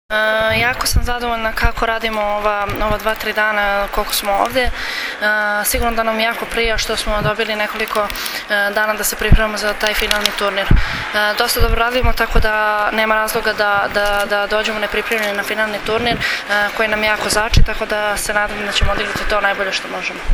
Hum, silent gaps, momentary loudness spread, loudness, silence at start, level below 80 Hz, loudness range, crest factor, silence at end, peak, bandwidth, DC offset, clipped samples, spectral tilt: none; none; 4 LU; -17 LUFS; 0.1 s; -24 dBFS; 2 LU; 16 dB; 0 s; 0 dBFS; over 20 kHz; under 0.1%; under 0.1%; -3 dB/octave